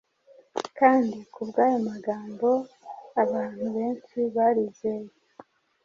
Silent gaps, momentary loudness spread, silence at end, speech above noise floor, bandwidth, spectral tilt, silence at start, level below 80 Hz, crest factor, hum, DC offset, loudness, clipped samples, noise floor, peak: none; 15 LU; 0.75 s; 32 dB; 7.6 kHz; -6.5 dB/octave; 0.55 s; -72 dBFS; 22 dB; none; under 0.1%; -26 LUFS; under 0.1%; -57 dBFS; -6 dBFS